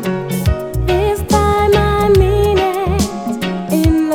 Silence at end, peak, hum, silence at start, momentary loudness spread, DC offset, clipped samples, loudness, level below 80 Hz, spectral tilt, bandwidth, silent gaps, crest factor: 0 s; 0 dBFS; none; 0 s; 7 LU; under 0.1%; under 0.1%; -15 LUFS; -22 dBFS; -6 dB/octave; 17.5 kHz; none; 14 dB